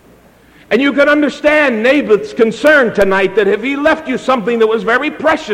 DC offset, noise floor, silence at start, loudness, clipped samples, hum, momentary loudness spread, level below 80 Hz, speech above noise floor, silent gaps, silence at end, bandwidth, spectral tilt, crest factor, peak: under 0.1%; -44 dBFS; 0.7 s; -12 LUFS; under 0.1%; none; 5 LU; -44 dBFS; 33 dB; none; 0 s; 15.5 kHz; -5 dB/octave; 12 dB; 0 dBFS